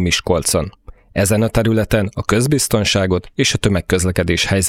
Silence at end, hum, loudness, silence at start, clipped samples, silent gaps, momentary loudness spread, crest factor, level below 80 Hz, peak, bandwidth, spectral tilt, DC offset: 0 s; none; -16 LUFS; 0 s; under 0.1%; none; 4 LU; 16 dB; -34 dBFS; 0 dBFS; 16.5 kHz; -4.5 dB/octave; under 0.1%